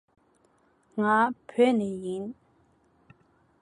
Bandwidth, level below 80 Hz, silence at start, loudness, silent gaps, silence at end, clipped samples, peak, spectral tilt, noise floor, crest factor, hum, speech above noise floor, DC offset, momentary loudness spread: 11 kHz; -72 dBFS; 0.95 s; -26 LUFS; none; 1.3 s; under 0.1%; -10 dBFS; -6.5 dB/octave; -66 dBFS; 20 dB; none; 40 dB; under 0.1%; 14 LU